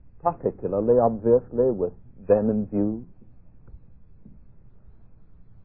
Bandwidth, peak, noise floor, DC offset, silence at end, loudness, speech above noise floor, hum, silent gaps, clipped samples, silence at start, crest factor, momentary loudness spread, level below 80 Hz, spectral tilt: 2.7 kHz; -6 dBFS; -51 dBFS; 0.4%; 1.85 s; -23 LUFS; 28 dB; none; none; under 0.1%; 0.25 s; 20 dB; 9 LU; -50 dBFS; -15 dB/octave